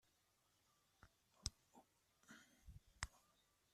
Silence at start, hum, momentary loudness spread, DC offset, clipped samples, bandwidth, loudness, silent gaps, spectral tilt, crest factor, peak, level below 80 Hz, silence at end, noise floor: 1 s; none; 15 LU; under 0.1%; under 0.1%; 14 kHz; -54 LUFS; none; -2 dB/octave; 36 dB; -26 dBFS; -68 dBFS; 0.55 s; -82 dBFS